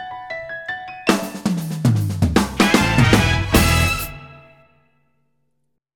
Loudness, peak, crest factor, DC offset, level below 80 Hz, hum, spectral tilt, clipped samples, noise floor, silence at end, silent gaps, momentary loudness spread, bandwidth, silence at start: -18 LUFS; 0 dBFS; 20 dB; under 0.1%; -30 dBFS; 60 Hz at -40 dBFS; -5 dB/octave; under 0.1%; -72 dBFS; 1.55 s; none; 15 LU; 19.5 kHz; 0 s